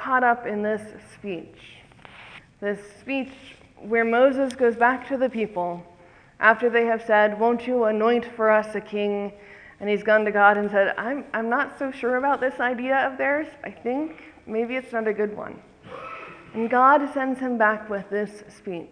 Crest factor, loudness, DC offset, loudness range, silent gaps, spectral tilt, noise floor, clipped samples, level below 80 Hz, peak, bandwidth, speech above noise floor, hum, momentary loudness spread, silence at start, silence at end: 22 dB; -23 LUFS; under 0.1%; 7 LU; none; -6 dB/octave; -47 dBFS; under 0.1%; -64 dBFS; -2 dBFS; 10.5 kHz; 24 dB; none; 17 LU; 0 s; 0.05 s